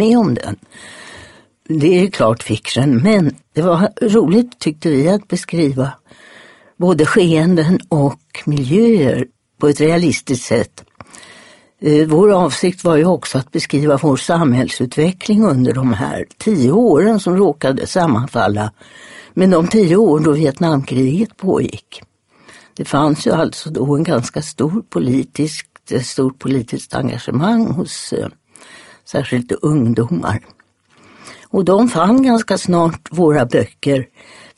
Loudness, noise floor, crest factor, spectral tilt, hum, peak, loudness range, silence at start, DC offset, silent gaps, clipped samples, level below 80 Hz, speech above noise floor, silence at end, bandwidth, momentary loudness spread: -15 LUFS; -51 dBFS; 14 dB; -6.5 dB/octave; none; 0 dBFS; 5 LU; 0 s; under 0.1%; none; under 0.1%; -48 dBFS; 37 dB; 0.55 s; 11.5 kHz; 10 LU